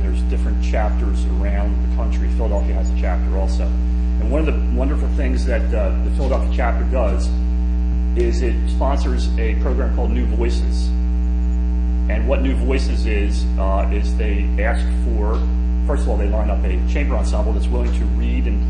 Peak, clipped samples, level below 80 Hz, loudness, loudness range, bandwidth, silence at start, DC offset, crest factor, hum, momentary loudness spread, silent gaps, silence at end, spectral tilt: -4 dBFS; under 0.1%; -18 dBFS; -20 LUFS; 1 LU; 8.8 kHz; 0 s; under 0.1%; 12 dB; none; 1 LU; none; 0 s; -7.5 dB/octave